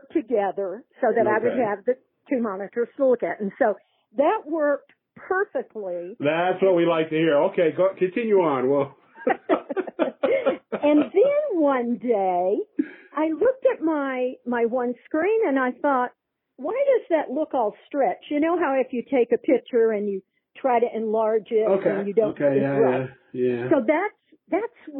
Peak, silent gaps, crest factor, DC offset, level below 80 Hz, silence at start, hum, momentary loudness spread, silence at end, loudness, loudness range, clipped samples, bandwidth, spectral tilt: -6 dBFS; none; 18 dB; under 0.1%; -72 dBFS; 0.15 s; none; 8 LU; 0 s; -23 LUFS; 3 LU; under 0.1%; 4 kHz; -11 dB/octave